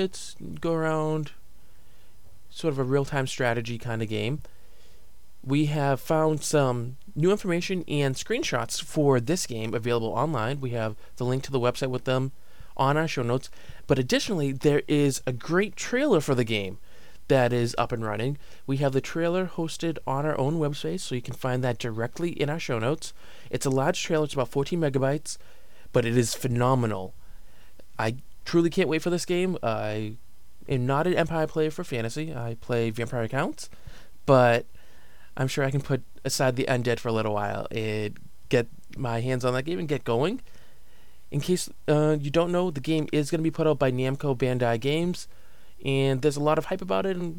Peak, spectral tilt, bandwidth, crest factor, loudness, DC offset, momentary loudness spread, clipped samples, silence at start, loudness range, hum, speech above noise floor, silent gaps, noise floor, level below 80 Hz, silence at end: -6 dBFS; -5.5 dB/octave; 18 kHz; 20 dB; -27 LUFS; 1%; 9 LU; under 0.1%; 0 s; 4 LU; none; 30 dB; none; -56 dBFS; -52 dBFS; 0 s